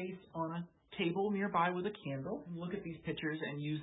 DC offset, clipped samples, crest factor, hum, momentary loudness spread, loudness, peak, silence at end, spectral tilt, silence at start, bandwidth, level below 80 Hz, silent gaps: under 0.1%; under 0.1%; 18 dB; none; 9 LU; -39 LUFS; -20 dBFS; 0 s; -3.5 dB/octave; 0 s; 3.9 kHz; -70 dBFS; none